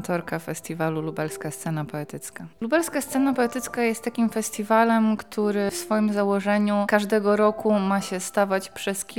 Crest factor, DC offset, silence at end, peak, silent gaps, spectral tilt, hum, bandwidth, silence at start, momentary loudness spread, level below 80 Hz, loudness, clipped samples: 18 dB; 0.2%; 0 s; -4 dBFS; none; -5 dB/octave; none; 18 kHz; 0 s; 10 LU; -64 dBFS; -24 LUFS; under 0.1%